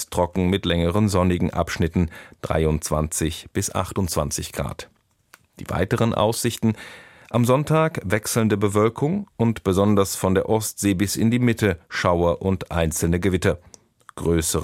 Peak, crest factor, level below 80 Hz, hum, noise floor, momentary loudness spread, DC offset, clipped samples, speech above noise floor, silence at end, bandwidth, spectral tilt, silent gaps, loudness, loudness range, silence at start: -4 dBFS; 18 dB; -40 dBFS; none; -56 dBFS; 7 LU; under 0.1%; under 0.1%; 34 dB; 0 s; 16.5 kHz; -5.5 dB/octave; none; -22 LUFS; 4 LU; 0 s